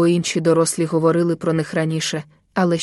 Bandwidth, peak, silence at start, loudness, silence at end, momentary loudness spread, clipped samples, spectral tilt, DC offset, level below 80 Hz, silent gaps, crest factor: 12 kHz; -4 dBFS; 0 s; -19 LUFS; 0 s; 7 LU; under 0.1%; -5.5 dB/octave; under 0.1%; -60 dBFS; none; 14 dB